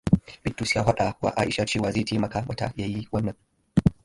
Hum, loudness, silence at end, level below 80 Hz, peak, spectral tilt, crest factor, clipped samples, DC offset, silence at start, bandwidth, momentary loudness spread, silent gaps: none; -26 LUFS; 0.15 s; -42 dBFS; -4 dBFS; -6 dB/octave; 20 dB; under 0.1%; under 0.1%; 0.05 s; 11.5 kHz; 7 LU; none